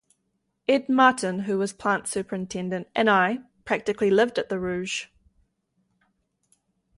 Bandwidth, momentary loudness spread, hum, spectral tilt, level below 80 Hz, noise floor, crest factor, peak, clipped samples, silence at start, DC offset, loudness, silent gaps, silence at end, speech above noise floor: 11.5 kHz; 11 LU; none; -4.5 dB/octave; -62 dBFS; -75 dBFS; 20 dB; -6 dBFS; under 0.1%; 0.7 s; under 0.1%; -24 LUFS; none; 1.9 s; 52 dB